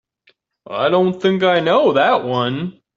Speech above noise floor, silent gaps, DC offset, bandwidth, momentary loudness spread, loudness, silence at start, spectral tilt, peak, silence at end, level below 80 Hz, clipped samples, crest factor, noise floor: 44 dB; none; under 0.1%; 7.4 kHz; 8 LU; -16 LUFS; 0.7 s; -7 dB/octave; -2 dBFS; 0.25 s; -62 dBFS; under 0.1%; 14 dB; -59 dBFS